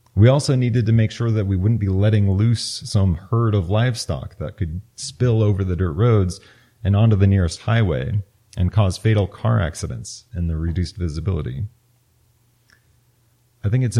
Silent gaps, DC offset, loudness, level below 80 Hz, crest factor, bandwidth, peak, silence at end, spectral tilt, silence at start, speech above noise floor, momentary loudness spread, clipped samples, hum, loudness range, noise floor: none; under 0.1%; -20 LUFS; -38 dBFS; 16 dB; 11.5 kHz; -2 dBFS; 0 s; -7 dB/octave; 0.15 s; 42 dB; 12 LU; under 0.1%; none; 8 LU; -60 dBFS